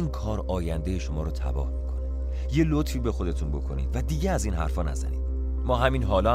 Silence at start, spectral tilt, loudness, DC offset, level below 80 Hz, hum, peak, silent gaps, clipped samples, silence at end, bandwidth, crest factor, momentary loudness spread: 0 s; -6.5 dB/octave; -28 LUFS; under 0.1%; -28 dBFS; none; -6 dBFS; none; under 0.1%; 0 s; 14 kHz; 18 dB; 7 LU